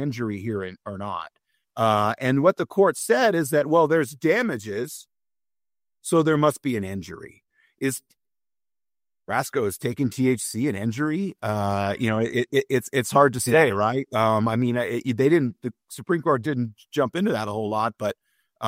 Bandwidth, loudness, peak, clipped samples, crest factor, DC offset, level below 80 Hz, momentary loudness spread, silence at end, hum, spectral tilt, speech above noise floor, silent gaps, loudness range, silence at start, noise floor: 16 kHz; -23 LUFS; -4 dBFS; under 0.1%; 20 dB; under 0.1%; -64 dBFS; 13 LU; 0 s; none; -5.5 dB/octave; over 67 dB; none; 6 LU; 0 s; under -90 dBFS